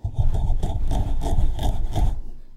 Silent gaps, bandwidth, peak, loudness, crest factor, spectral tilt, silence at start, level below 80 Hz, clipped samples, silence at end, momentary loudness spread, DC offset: none; 9.2 kHz; -8 dBFS; -27 LUFS; 12 dB; -7 dB/octave; 0.05 s; -22 dBFS; under 0.1%; 0 s; 2 LU; under 0.1%